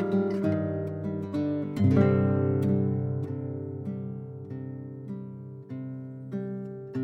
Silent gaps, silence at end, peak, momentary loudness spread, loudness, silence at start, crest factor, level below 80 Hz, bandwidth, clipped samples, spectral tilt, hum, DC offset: none; 0 s; -10 dBFS; 16 LU; -29 LUFS; 0 s; 18 dB; -66 dBFS; 6.2 kHz; under 0.1%; -10.5 dB/octave; none; under 0.1%